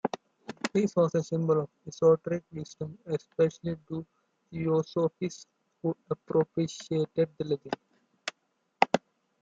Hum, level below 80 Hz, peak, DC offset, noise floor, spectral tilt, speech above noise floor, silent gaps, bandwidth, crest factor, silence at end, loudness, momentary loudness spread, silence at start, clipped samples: none; -70 dBFS; -4 dBFS; under 0.1%; -76 dBFS; -6.5 dB/octave; 47 dB; none; 7.8 kHz; 26 dB; 0.45 s; -30 LUFS; 14 LU; 0.05 s; under 0.1%